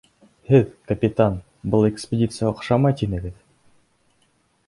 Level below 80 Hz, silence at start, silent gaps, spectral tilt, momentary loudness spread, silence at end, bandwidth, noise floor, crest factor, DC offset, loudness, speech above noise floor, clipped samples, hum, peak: -44 dBFS; 0.5 s; none; -8 dB/octave; 9 LU; 1.35 s; 11.5 kHz; -64 dBFS; 20 dB; under 0.1%; -21 LUFS; 44 dB; under 0.1%; none; -2 dBFS